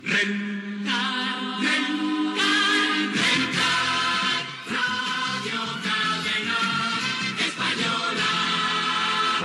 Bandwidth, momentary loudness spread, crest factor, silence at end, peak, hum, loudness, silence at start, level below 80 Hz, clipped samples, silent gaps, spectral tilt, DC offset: 12.5 kHz; 6 LU; 16 dB; 0 s; -10 dBFS; none; -23 LUFS; 0 s; -72 dBFS; under 0.1%; none; -2.5 dB/octave; under 0.1%